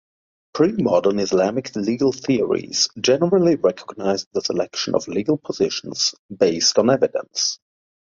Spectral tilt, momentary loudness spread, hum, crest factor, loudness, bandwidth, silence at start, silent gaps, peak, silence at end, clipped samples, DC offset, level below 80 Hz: -4 dB/octave; 7 LU; none; 18 dB; -20 LUFS; 7.6 kHz; 0.55 s; 4.26-4.31 s, 6.19-6.29 s; -2 dBFS; 0.45 s; under 0.1%; under 0.1%; -58 dBFS